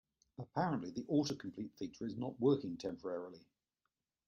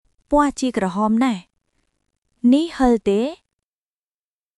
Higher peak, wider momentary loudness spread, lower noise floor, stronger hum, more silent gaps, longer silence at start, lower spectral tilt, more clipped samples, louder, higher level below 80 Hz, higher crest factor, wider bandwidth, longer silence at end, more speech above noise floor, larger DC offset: second, -20 dBFS vs -4 dBFS; first, 12 LU vs 5 LU; about the same, -89 dBFS vs under -90 dBFS; neither; second, none vs 2.18-2.22 s; about the same, 0.4 s vs 0.3 s; about the same, -6.5 dB/octave vs -5.5 dB/octave; neither; second, -40 LUFS vs -19 LUFS; second, -76 dBFS vs -44 dBFS; about the same, 20 dB vs 18 dB; second, 7.4 kHz vs 11.5 kHz; second, 0.9 s vs 1.25 s; second, 50 dB vs over 72 dB; neither